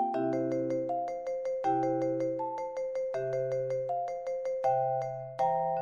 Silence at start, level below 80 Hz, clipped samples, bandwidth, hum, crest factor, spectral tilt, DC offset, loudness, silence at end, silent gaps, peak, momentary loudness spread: 0 s; -72 dBFS; under 0.1%; 7 kHz; none; 14 dB; -8 dB/octave; under 0.1%; -32 LUFS; 0 s; none; -18 dBFS; 6 LU